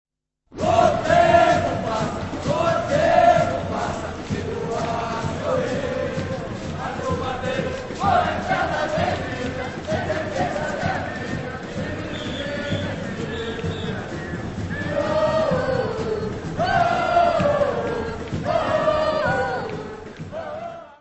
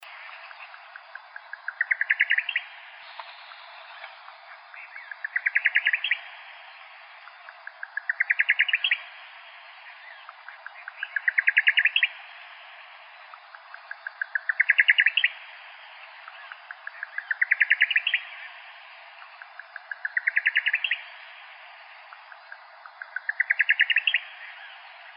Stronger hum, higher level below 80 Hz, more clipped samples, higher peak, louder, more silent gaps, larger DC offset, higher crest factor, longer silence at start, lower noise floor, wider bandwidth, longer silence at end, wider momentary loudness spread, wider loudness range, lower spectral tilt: neither; first, -42 dBFS vs under -90 dBFS; neither; about the same, -4 dBFS vs -4 dBFS; about the same, -23 LUFS vs -23 LUFS; neither; neither; second, 18 dB vs 24 dB; first, 0.5 s vs 0 s; first, -51 dBFS vs -47 dBFS; first, 8.4 kHz vs 5.4 kHz; about the same, 0.05 s vs 0.05 s; second, 12 LU vs 25 LU; first, 7 LU vs 4 LU; first, -6 dB/octave vs 14 dB/octave